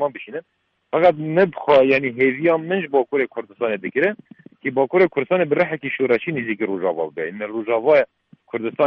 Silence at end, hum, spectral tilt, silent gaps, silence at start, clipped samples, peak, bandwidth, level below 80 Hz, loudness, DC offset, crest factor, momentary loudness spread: 0 s; none; -8.5 dB/octave; none; 0 s; under 0.1%; -2 dBFS; 5.8 kHz; -64 dBFS; -20 LUFS; under 0.1%; 18 dB; 11 LU